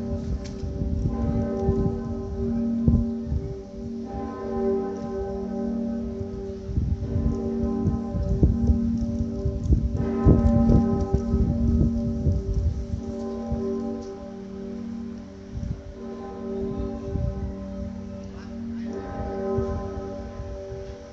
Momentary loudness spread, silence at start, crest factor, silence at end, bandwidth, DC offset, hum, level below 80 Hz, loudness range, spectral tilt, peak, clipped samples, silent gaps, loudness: 13 LU; 0 s; 20 dB; 0 s; 7.4 kHz; under 0.1%; none; -32 dBFS; 10 LU; -9.5 dB/octave; -6 dBFS; under 0.1%; none; -27 LUFS